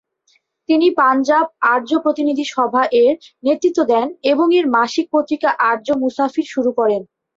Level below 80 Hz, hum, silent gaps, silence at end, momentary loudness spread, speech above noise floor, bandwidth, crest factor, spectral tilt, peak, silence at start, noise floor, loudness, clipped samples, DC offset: -64 dBFS; none; none; 0.35 s; 6 LU; 45 dB; 7.8 kHz; 14 dB; -4 dB/octave; -2 dBFS; 0.7 s; -61 dBFS; -16 LUFS; under 0.1%; under 0.1%